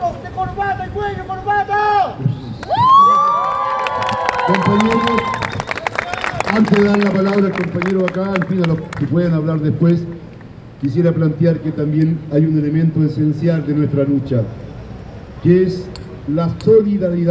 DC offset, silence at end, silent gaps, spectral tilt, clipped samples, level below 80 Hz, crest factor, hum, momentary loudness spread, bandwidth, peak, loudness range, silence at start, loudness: under 0.1%; 0 s; none; -7.5 dB/octave; under 0.1%; -40 dBFS; 16 dB; none; 11 LU; 8 kHz; 0 dBFS; 4 LU; 0 s; -16 LUFS